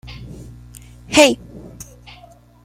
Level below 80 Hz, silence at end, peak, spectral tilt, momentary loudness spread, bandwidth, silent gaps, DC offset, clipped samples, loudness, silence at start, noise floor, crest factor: -44 dBFS; 1.05 s; 0 dBFS; -3 dB/octave; 26 LU; 16.5 kHz; none; under 0.1%; under 0.1%; -14 LUFS; 0.1 s; -46 dBFS; 22 dB